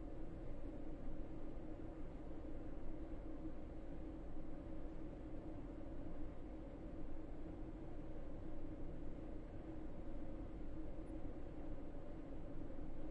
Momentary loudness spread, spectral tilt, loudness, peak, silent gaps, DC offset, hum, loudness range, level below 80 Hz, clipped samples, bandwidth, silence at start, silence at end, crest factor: 1 LU; -9 dB/octave; -53 LUFS; -34 dBFS; none; under 0.1%; none; 0 LU; -50 dBFS; under 0.1%; 3.8 kHz; 0 s; 0 s; 12 dB